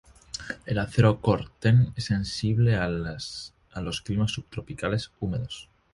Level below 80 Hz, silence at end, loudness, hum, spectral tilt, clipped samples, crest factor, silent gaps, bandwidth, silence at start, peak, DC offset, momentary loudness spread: -46 dBFS; 0.3 s; -27 LUFS; none; -6.5 dB/octave; under 0.1%; 20 dB; none; 11.5 kHz; 0.35 s; -6 dBFS; under 0.1%; 16 LU